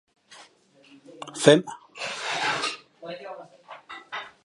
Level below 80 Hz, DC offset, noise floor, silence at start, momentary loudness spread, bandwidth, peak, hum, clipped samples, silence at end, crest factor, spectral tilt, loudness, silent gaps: -76 dBFS; under 0.1%; -57 dBFS; 0.3 s; 24 LU; 11.5 kHz; 0 dBFS; none; under 0.1%; 0.15 s; 26 dB; -4 dB/octave; -24 LUFS; none